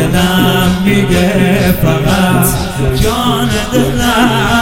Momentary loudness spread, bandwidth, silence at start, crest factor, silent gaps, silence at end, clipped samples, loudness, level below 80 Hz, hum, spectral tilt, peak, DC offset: 3 LU; 17 kHz; 0 s; 10 dB; none; 0 s; under 0.1%; -11 LUFS; -24 dBFS; none; -5 dB/octave; 0 dBFS; 0.4%